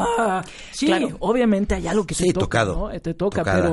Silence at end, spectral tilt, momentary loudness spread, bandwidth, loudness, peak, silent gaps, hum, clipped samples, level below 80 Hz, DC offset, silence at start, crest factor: 0 s; -5.5 dB/octave; 7 LU; 11.5 kHz; -21 LUFS; -6 dBFS; none; none; under 0.1%; -36 dBFS; under 0.1%; 0 s; 14 dB